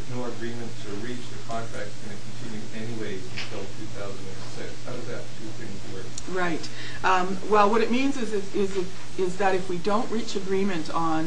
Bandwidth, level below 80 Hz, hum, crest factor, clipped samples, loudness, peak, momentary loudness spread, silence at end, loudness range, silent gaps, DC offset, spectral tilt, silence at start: 10.5 kHz; -58 dBFS; none; 22 dB; under 0.1%; -29 LUFS; -6 dBFS; 14 LU; 0 s; 11 LU; none; 7%; -5 dB/octave; 0 s